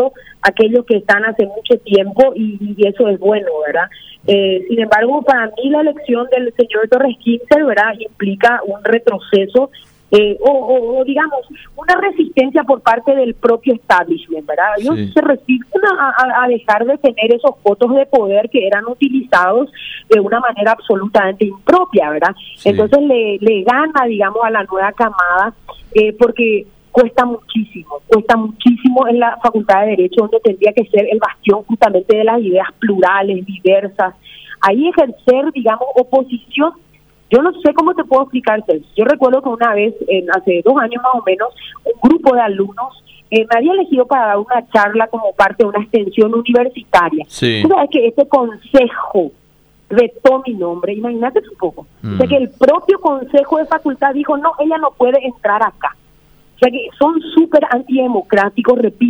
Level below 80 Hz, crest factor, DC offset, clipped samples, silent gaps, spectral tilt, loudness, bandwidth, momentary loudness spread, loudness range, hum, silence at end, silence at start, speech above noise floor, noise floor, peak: -50 dBFS; 12 dB; under 0.1%; under 0.1%; none; -6.5 dB/octave; -13 LUFS; 10.5 kHz; 6 LU; 2 LU; none; 0 s; 0 s; 38 dB; -51 dBFS; 0 dBFS